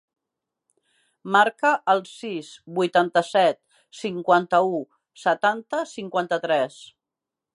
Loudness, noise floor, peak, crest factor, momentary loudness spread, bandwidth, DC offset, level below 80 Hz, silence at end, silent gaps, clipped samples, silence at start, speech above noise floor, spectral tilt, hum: -23 LUFS; -87 dBFS; -4 dBFS; 20 dB; 13 LU; 11.5 kHz; under 0.1%; -78 dBFS; 0.7 s; none; under 0.1%; 1.25 s; 65 dB; -4.5 dB/octave; none